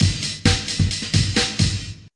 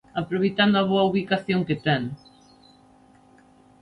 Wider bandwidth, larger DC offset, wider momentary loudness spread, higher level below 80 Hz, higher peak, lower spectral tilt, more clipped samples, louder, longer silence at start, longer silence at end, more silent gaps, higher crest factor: first, 11.5 kHz vs 5.8 kHz; neither; second, 3 LU vs 8 LU; first, -34 dBFS vs -60 dBFS; first, -2 dBFS vs -8 dBFS; second, -4 dB/octave vs -7.5 dB/octave; neither; first, -20 LUFS vs -23 LUFS; second, 0 s vs 0.15 s; second, 0.1 s vs 1.65 s; neither; about the same, 18 dB vs 18 dB